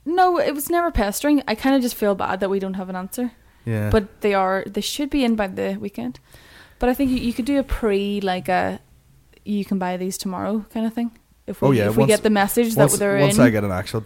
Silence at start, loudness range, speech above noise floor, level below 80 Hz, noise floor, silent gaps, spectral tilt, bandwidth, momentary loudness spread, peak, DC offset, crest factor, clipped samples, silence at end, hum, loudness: 0.05 s; 6 LU; 33 dB; -38 dBFS; -53 dBFS; none; -5.5 dB/octave; 17 kHz; 12 LU; -2 dBFS; under 0.1%; 20 dB; under 0.1%; 0 s; none; -21 LUFS